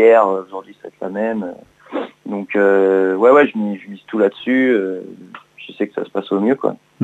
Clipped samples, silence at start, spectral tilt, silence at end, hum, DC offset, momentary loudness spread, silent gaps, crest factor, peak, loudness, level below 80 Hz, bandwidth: under 0.1%; 0 s; -7.5 dB/octave; 0 s; none; under 0.1%; 19 LU; none; 16 dB; 0 dBFS; -17 LUFS; -68 dBFS; 8 kHz